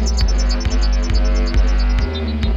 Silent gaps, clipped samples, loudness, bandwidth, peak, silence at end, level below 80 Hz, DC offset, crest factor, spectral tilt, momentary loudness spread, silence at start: none; under 0.1%; -19 LUFS; 7.6 kHz; -4 dBFS; 0 s; -16 dBFS; under 0.1%; 10 dB; -5.5 dB/octave; 2 LU; 0 s